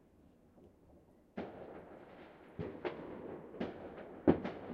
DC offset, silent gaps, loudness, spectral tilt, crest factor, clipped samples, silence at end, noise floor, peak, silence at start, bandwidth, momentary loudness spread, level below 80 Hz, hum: under 0.1%; none; -41 LUFS; -9 dB/octave; 28 dB; under 0.1%; 0 s; -65 dBFS; -14 dBFS; 0.2 s; 6.2 kHz; 21 LU; -66 dBFS; none